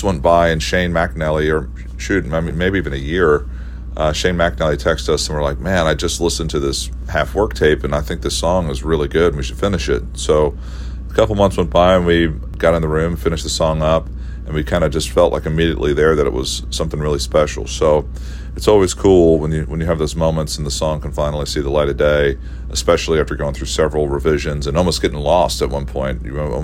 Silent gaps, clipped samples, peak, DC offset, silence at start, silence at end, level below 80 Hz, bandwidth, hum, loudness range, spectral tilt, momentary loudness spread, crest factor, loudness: none; under 0.1%; 0 dBFS; under 0.1%; 0 s; 0 s; -26 dBFS; 16 kHz; none; 2 LU; -5 dB/octave; 8 LU; 16 dB; -17 LUFS